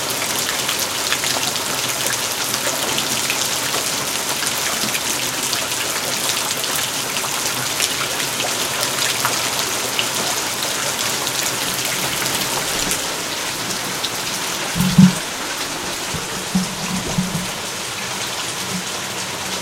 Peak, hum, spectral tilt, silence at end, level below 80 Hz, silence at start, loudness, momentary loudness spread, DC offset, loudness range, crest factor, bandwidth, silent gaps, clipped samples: 0 dBFS; none; -2 dB/octave; 0 s; -48 dBFS; 0 s; -19 LUFS; 5 LU; under 0.1%; 2 LU; 20 dB; 17 kHz; none; under 0.1%